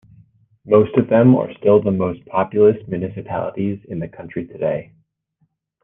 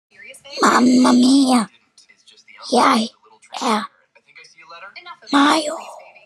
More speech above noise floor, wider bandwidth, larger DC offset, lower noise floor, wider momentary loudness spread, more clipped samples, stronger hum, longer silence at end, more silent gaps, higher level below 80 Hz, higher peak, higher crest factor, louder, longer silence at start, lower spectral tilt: first, 49 dB vs 38 dB; second, 3.7 kHz vs 12.5 kHz; neither; first, -67 dBFS vs -53 dBFS; second, 15 LU vs 23 LU; neither; neither; first, 1 s vs 0.25 s; neither; first, -56 dBFS vs -80 dBFS; about the same, -2 dBFS vs 0 dBFS; about the same, 16 dB vs 18 dB; about the same, -18 LUFS vs -16 LUFS; first, 0.65 s vs 0.3 s; first, -11.5 dB/octave vs -3 dB/octave